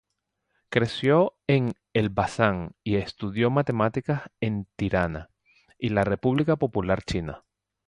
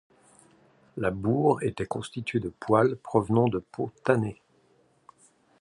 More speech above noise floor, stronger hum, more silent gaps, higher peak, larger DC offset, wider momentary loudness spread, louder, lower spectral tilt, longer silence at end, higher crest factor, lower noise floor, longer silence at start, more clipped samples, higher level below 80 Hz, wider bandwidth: first, 54 dB vs 38 dB; neither; neither; about the same, -6 dBFS vs -6 dBFS; neither; about the same, 9 LU vs 10 LU; about the same, -26 LUFS vs -27 LUFS; about the same, -7 dB/octave vs -7.5 dB/octave; second, 0.5 s vs 1.3 s; about the same, 20 dB vs 22 dB; first, -79 dBFS vs -65 dBFS; second, 0.7 s vs 0.95 s; neither; first, -48 dBFS vs -56 dBFS; about the same, 11 kHz vs 11 kHz